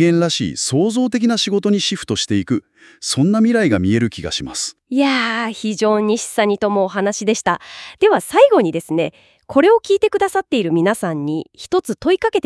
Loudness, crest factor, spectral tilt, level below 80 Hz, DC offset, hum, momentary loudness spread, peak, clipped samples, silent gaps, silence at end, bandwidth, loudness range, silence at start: -17 LUFS; 16 dB; -4.5 dB/octave; -54 dBFS; under 0.1%; none; 9 LU; 0 dBFS; under 0.1%; none; 0.05 s; 12 kHz; 2 LU; 0 s